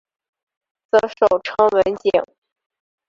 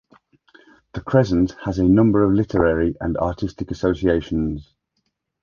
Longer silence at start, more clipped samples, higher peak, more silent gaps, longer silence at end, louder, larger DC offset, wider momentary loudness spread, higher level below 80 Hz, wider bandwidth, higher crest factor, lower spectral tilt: about the same, 0.95 s vs 0.95 s; neither; about the same, -2 dBFS vs -2 dBFS; neither; about the same, 0.85 s vs 0.8 s; about the same, -18 LUFS vs -20 LUFS; neither; second, 5 LU vs 12 LU; second, -56 dBFS vs -38 dBFS; about the same, 7.6 kHz vs 7 kHz; about the same, 18 dB vs 18 dB; second, -5 dB/octave vs -8.5 dB/octave